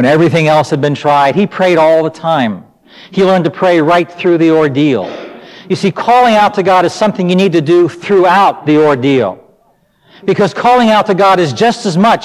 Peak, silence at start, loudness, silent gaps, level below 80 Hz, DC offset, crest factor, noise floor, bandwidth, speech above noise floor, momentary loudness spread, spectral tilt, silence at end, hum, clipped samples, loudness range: 0 dBFS; 0 s; -10 LUFS; none; -52 dBFS; under 0.1%; 10 dB; -53 dBFS; 14 kHz; 43 dB; 7 LU; -6 dB/octave; 0 s; none; under 0.1%; 2 LU